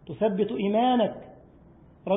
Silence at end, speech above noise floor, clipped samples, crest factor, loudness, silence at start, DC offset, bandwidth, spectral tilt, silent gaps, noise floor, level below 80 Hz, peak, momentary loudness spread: 0 s; 29 dB; under 0.1%; 14 dB; -25 LUFS; 0.05 s; under 0.1%; 3.9 kHz; -11 dB/octave; none; -53 dBFS; -60 dBFS; -12 dBFS; 16 LU